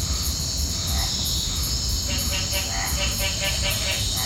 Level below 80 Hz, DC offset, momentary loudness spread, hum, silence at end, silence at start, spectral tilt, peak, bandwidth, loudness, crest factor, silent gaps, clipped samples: -30 dBFS; under 0.1%; 2 LU; none; 0 s; 0 s; -2 dB/octave; -10 dBFS; 17 kHz; -23 LUFS; 14 dB; none; under 0.1%